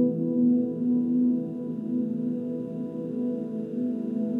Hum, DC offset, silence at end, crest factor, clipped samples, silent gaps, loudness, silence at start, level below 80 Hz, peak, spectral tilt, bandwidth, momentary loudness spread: none; under 0.1%; 0 s; 12 dB; under 0.1%; none; -28 LUFS; 0 s; -78 dBFS; -14 dBFS; -11.5 dB/octave; 2.8 kHz; 9 LU